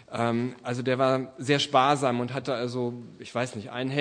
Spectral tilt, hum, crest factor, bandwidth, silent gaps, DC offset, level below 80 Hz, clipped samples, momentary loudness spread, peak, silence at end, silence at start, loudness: -5.5 dB/octave; none; 20 dB; 10.5 kHz; none; under 0.1%; -70 dBFS; under 0.1%; 11 LU; -6 dBFS; 0 s; 0.1 s; -27 LUFS